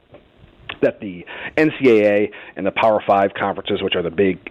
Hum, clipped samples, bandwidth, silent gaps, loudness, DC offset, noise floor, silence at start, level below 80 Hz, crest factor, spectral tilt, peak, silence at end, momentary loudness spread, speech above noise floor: none; under 0.1%; 8 kHz; none; -18 LUFS; under 0.1%; -48 dBFS; 0.15 s; -54 dBFS; 16 dB; -7 dB/octave; -4 dBFS; 0.15 s; 16 LU; 30 dB